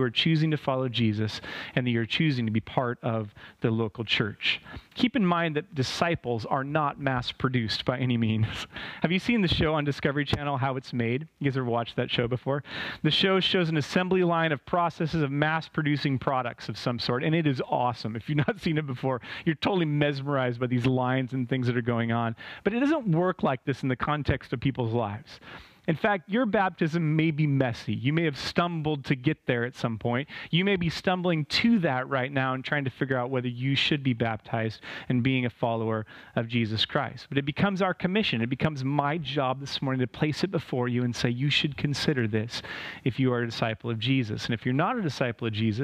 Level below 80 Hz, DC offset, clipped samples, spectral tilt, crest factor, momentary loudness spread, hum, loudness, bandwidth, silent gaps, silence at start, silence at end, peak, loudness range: -54 dBFS; under 0.1%; under 0.1%; -6.5 dB/octave; 20 dB; 6 LU; none; -27 LUFS; 11.5 kHz; none; 0 s; 0 s; -8 dBFS; 2 LU